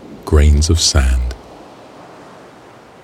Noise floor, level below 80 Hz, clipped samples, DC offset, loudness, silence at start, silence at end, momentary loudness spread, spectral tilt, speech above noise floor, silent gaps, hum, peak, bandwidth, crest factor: -41 dBFS; -18 dBFS; under 0.1%; under 0.1%; -14 LUFS; 0 s; 1.5 s; 13 LU; -4.5 dB/octave; 29 dB; none; none; 0 dBFS; 13.5 kHz; 16 dB